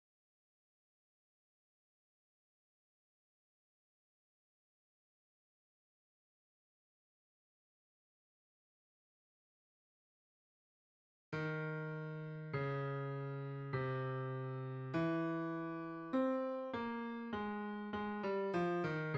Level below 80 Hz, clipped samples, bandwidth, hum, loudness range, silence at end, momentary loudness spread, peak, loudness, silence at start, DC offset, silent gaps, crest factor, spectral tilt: -78 dBFS; under 0.1%; 7.4 kHz; none; 8 LU; 0 s; 7 LU; -26 dBFS; -41 LUFS; 11.3 s; under 0.1%; none; 18 dB; -8.5 dB/octave